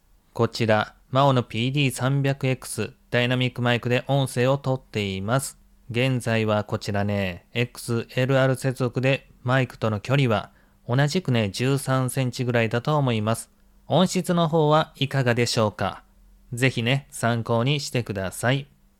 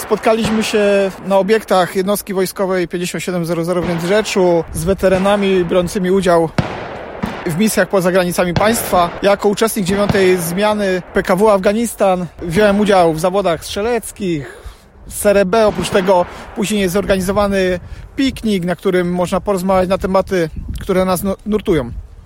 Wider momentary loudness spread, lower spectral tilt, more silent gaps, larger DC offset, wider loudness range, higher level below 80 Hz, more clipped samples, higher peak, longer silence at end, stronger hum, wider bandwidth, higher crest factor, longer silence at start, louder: about the same, 7 LU vs 8 LU; about the same, -5.5 dB/octave vs -5 dB/octave; neither; neither; about the same, 2 LU vs 2 LU; second, -56 dBFS vs -36 dBFS; neither; second, -6 dBFS vs -2 dBFS; first, 0.35 s vs 0.05 s; neither; about the same, 15 kHz vs 16.5 kHz; about the same, 16 dB vs 14 dB; first, 0.35 s vs 0 s; second, -24 LUFS vs -15 LUFS